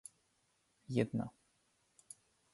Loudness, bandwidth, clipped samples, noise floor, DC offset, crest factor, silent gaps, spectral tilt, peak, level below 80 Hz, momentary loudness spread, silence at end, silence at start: -39 LUFS; 11.5 kHz; under 0.1%; -78 dBFS; under 0.1%; 26 dB; none; -6.5 dB/octave; -18 dBFS; -74 dBFS; 21 LU; 1.25 s; 0.9 s